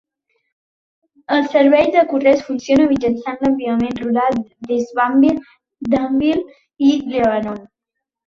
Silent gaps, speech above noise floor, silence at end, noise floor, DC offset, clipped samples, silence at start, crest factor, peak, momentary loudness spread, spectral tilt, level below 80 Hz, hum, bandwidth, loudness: none; 65 dB; 0.6 s; -81 dBFS; under 0.1%; under 0.1%; 1.3 s; 16 dB; -2 dBFS; 10 LU; -6 dB/octave; -50 dBFS; none; 7 kHz; -16 LUFS